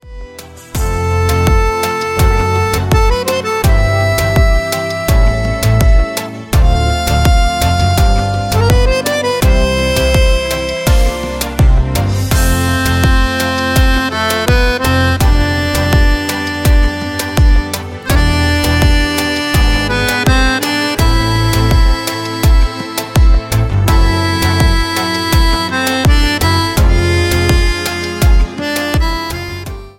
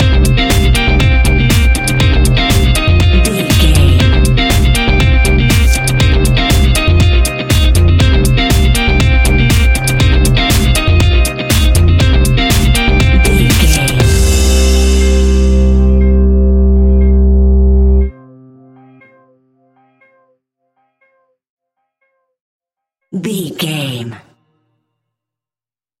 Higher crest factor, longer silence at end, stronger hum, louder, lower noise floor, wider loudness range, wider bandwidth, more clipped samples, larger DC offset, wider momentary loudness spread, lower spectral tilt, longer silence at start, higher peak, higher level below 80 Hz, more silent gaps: about the same, 12 dB vs 10 dB; second, 0.1 s vs 1.85 s; neither; second, -13 LUFS vs -10 LUFS; second, -32 dBFS vs under -90 dBFS; second, 1 LU vs 13 LU; about the same, 17 kHz vs 17 kHz; neither; neither; about the same, 5 LU vs 3 LU; about the same, -5 dB/octave vs -5 dB/octave; about the same, 0.05 s vs 0 s; about the same, 0 dBFS vs 0 dBFS; about the same, -14 dBFS vs -12 dBFS; second, none vs 21.49-21.57 s, 22.40-22.60 s